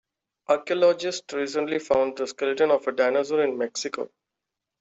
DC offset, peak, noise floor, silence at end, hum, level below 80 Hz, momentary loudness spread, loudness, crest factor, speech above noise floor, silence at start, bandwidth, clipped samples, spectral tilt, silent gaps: under 0.1%; -8 dBFS; -85 dBFS; 0.75 s; none; -68 dBFS; 9 LU; -25 LUFS; 18 dB; 62 dB; 0.5 s; 8 kHz; under 0.1%; -3.5 dB/octave; none